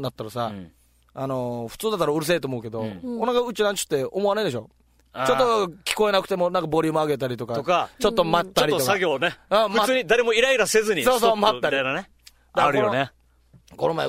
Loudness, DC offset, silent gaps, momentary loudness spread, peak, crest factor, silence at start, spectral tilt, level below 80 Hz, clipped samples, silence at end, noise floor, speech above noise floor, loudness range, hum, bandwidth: -22 LUFS; under 0.1%; none; 11 LU; -4 dBFS; 20 dB; 0 s; -4 dB/octave; -54 dBFS; under 0.1%; 0 s; -56 dBFS; 34 dB; 5 LU; none; 16 kHz